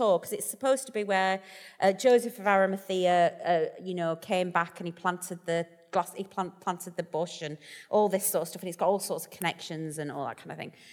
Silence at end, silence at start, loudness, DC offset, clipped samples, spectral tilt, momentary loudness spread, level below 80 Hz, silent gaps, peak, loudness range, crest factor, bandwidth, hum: 0 s; 0 s; -29 LUFS; under 0.1%; under 0.1%; -4 dB/octave; 12 LU; -78 dBFS; none; -10 dBFS; 6 LU; 20 dB; 19.5 kHz; none